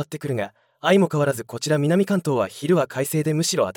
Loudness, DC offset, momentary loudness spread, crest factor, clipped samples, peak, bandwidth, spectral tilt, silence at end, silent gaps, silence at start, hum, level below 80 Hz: -22 LUFS; under 0.1%; 9 LU; 16 dB; under 0.1%; -6 dBFS; 18 kHz; -5.5 dB/octave; 0.05 s; none; 0 s; none; -68 dBFS